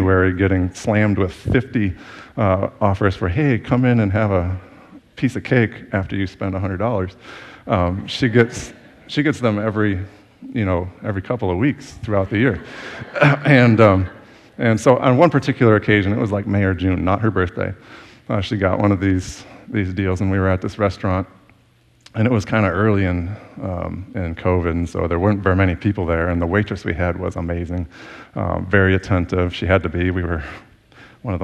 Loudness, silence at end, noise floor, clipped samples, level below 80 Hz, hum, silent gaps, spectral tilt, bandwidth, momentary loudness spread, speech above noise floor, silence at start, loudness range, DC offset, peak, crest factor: -19 LUFS; 0 s; -55 dBFS; under 0.1%; -40 dBFS; none; none; -7.5 dB/octave; 9.8 kHz; 13 LU; 37 dB; 0 s; 6 LU; under 0.1%; 0 dBFS; 18 dB